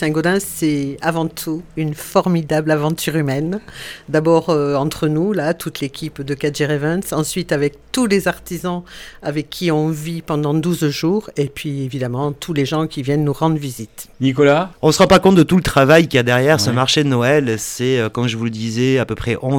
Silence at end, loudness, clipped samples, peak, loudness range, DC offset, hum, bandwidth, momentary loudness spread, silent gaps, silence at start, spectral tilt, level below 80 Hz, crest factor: 0 s; -17 LUFS; under 0.1%; 0 dBFS; 7 LU; under 0.1%; none; 18.5 kHz; 11 LU; none; 0 s; -5.5 dB/octave; -44 dBFS; 16 dB